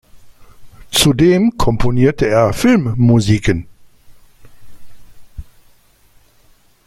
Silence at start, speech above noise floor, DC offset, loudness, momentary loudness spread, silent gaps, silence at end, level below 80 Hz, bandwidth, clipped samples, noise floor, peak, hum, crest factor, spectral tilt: 0.15 s; 38 dB; under 0.1%; -13 LUFS; 6 LU; none; 1.45 s; -32 dBFS; 16 kHz; under 0.1%; -50 dBFS; 0 dBFS; none; 16 dB; -5.5 dB/octave